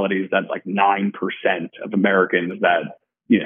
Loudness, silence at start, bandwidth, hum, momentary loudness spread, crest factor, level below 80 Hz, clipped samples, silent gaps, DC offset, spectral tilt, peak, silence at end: -20 LUFS; 0 s; 3.7 kHz; none; 8 LU; 18 dB; -74 dBFS; under 0.1%; none; under 0.1%; -4 dB/octave; -2 dBFS; 0 s